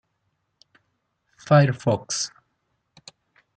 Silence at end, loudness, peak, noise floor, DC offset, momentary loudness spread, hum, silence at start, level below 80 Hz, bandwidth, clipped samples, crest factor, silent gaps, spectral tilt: 1.3 s; -22 LUFS; -4 dBFS; -74 dBFS; under 0.1%; 10 LU; none; 1.45 s; -66 dBFS; 9.2 kHz; under 0.1%; 22 dB; none; -5.5 dB/octave